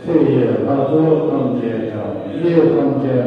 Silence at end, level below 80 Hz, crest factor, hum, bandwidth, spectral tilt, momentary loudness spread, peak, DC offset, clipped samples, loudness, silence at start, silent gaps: 0 s; -54 dBFS; 14 dB; none; 5.2 kHz; -10 dB/octave; 9 LU; -2 dBFS; under 0.1%; under 0.1%; -16 LUFS; 0 s; none